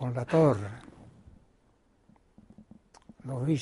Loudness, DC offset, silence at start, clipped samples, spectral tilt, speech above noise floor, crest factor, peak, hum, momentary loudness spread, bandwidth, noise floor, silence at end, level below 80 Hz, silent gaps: -28 LUFS; under 0.1%; 0 s; under 0.1%; -8 dB/octave; 40 dB; 22 dB; -10 dBFS; none; 23 LU; 11.5 kHz; -66 dBFS; 0 s; -60 dBFS; none